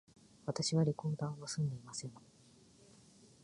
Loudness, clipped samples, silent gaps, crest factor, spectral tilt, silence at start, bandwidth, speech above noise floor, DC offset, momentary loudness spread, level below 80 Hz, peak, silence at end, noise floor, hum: -38 LUFS; under 0.1%; none; 18 dB; -5.5 dB/octave; 0.45 s; 11 kHz; 27 dB; under 0.1%; 13 LU; -72 dBFS; -22 dBFS; 1.25 s; -64 dBFS; none